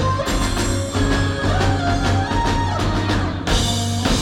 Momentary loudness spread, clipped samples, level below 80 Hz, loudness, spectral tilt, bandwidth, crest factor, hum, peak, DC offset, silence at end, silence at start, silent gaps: 2 LU; under 0.1%; -26 dBFS; -20 LUFS; -5 dB/octave; 15.5 kHz; 14 dB; none; -4 dBFS; under 0.1%; 0 s; 0 s; none